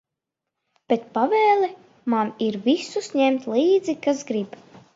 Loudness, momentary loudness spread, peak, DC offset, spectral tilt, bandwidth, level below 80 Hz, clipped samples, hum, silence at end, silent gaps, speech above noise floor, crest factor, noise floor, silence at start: -22 LUFS; 9 LU; -6 dBFS; under 0.1%; -5 dB/octave; 7.8 kHz; -74 dBFS; under 0.1%; none; 0.45 s; none; 63 dB; 16 dB; -84 dBFS; 0.9 s